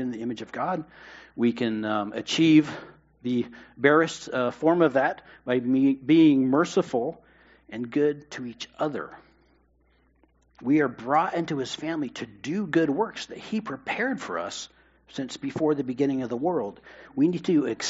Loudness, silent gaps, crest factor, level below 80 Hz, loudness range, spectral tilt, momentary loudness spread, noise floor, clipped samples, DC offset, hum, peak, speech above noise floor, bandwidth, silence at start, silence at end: -25 LUFS; none; 22 dB; -66 dBFS; 7 LU; -4.5 dB/octave; 16 LU; -64 dBFS; under 0.1%; under 0.1%; none; -4 dBFS; 39 dB; 8 kHz; 0 s; 0 s